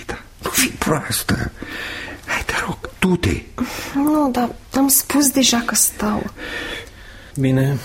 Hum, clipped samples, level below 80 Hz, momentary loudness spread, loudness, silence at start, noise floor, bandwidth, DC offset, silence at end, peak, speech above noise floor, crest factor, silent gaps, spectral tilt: none; under 0.1%; -38 dBFS; 14 LU; -19 LUFS; 0 s; -39 dBFS; 16.5 kHz; under 0.1%; 0 s; -2 dBFS; 20 dB; 18 dB; none; -3.5 dB/octave